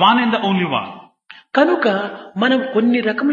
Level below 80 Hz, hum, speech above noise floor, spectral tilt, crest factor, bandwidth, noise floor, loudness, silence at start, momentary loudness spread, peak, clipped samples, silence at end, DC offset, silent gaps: -68 dBFS; none; 28 dB; -7 dB/octave; 16 dB; 7.2 kHz; -45 dBFS; -17 LUFS; 0 s; 8 LU; 0 dBFS; under 0.1%; 0 s; under 0.1%; none